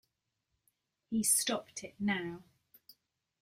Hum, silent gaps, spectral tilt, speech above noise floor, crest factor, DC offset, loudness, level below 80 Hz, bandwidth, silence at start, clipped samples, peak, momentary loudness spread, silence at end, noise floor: none; none; -2.5 dB/octave; 50 dB; 24 dB; under 0.1%; -32 LUFS; -74 dBFS; 16 kHz; 1.1 s; under 0.1%; -14 dBFS; 17 LU; 1 s; -84 dBFS